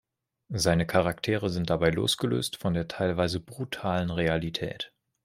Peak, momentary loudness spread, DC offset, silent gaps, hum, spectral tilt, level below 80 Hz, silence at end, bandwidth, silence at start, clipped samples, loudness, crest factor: -8 dBFS; 10 LU; under 0.1%; none; none; -5 dB/octave; -52 dBFS; 0.4 s; 16 kHz; 0.5 s; under 0.1%; -28 LUFS; 20 dB